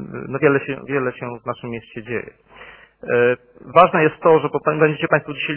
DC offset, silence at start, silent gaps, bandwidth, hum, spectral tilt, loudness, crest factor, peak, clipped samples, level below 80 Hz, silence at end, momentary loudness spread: under 0.1%; 0 s; none; 4 kHz; none; -10 dB/octave; -18 LUFS; 18 dB; 0 dBFS; under 0.1%; -58 dBFS; 0 s; 15 LU